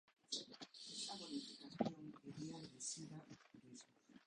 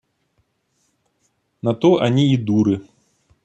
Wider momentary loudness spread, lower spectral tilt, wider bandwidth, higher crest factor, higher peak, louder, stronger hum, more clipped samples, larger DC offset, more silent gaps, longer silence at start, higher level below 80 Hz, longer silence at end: first, 16 LU vs 9 LU; second, -3.5 dB/octave vs -7.5 dB/octave; first, 11 kHz vs 8.2 kHz; first, 28 dB vs 18 dB; second, -24 dBFS vs -2 dBFS; second, -50 LUFS vs -18 LUFS; neither; neither; neither; neither; second, 0.1 s vs 1.65 s; second, -86 dBFS vs -60 dBFS; second, 0 s vs 0.6 s